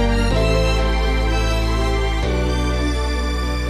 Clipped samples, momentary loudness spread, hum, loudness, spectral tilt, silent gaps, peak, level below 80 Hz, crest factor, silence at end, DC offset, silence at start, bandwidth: under 0.1%; 4 LU; none; -20 LUFS; -5.5 dB/octave; none; -6 dBFS; -20 dBFS; 12 dB; 0 s; under 0.1%; 0 s; 12.5 kHz